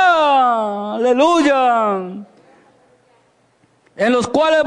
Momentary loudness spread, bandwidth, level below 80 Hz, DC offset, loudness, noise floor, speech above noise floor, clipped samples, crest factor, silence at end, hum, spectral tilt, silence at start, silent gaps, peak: 10 LU; 10.5 kHz; -60 dBFS; under 0.1%; -15 LUFS; -57 dBFS; 43 dB; under 0.1%; 12 dB; 0 s; none; -4.5 dB/octave; 0 s; none; -4 dBFS